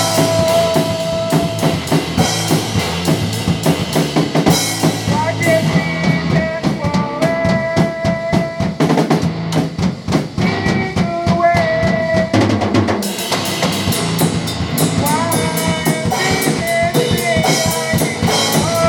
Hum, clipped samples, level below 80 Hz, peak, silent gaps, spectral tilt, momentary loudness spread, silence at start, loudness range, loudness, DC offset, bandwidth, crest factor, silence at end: none; under 0.1%; -40 dBFS; 0 dBFS; none; -4.5 dB/octave; 4 LU; 0 s; 1 LU; -15 LUFS; under 0.1%; 18 kHz; 16 dB; 0 s